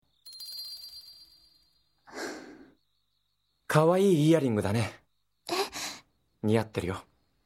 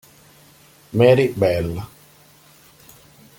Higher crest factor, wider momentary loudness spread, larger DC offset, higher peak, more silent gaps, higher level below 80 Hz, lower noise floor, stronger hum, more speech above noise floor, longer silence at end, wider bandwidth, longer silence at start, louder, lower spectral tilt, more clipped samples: about the same, 24 dB vs 20 dB; first, 23 LU vs 17 LU; neither; second, -6 dBFS vs -2 dBFS; neither; second, -64 dBFS vs -50 dBFS; first, -78 dBFS vs -50 dBFS; first, 50 Hz at -50 dBFS vs none; first, 53 dB vs 34 dB; second, 0.45 s vs 1.5 s; about the same, 17.5 kHz vs 17 kHz; second, 0.25 s vs 0.95 s; second, -28 LUFS vs -18 LUFS; about the same, -6 dB/octave vs -7 dB/octave; neither